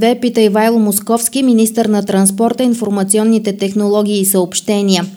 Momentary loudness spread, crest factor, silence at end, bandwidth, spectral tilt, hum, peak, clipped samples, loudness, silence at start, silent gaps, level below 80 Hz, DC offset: 3 LU; 12 dB; 0 s; 17.5 kHz; -4.5 dB/octave; none; 0 dBFS; under 0.1%; -13 LUFS; 0 s; none; -60 dBFS; under 0.1%